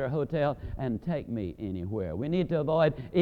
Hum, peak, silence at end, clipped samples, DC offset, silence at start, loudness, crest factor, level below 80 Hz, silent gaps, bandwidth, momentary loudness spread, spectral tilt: none; -12 dBFS; 0 s; under 0.1%; under 0.1%; 0 s; -30 LUFS; 18 dB; -50 dBFS; none; 5 kHz; 9 LU; -9.5 dB/octave